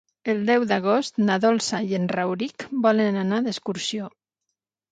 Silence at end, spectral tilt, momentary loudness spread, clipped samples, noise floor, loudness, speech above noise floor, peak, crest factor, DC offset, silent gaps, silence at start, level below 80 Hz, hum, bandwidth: 0.85 s; -5 dB/octave; 8 LU; under 0.1%; -82 dBFS; -23 LUFS; 59 dB; -6 dBFS; 18 dB; under 0.1%; none; 0.25 s; -70 dBFS; none; 9.4 kHz